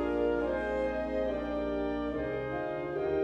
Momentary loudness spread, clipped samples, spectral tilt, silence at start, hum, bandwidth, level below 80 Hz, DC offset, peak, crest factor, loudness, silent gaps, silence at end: 4 LU; under 0.1%; -8 dB/octave; 0 s; none; 8.2 kHz; -48 dBFS; under 0.1%; -20 dBFS; 12 dB; -33 LUFS; none; 0 s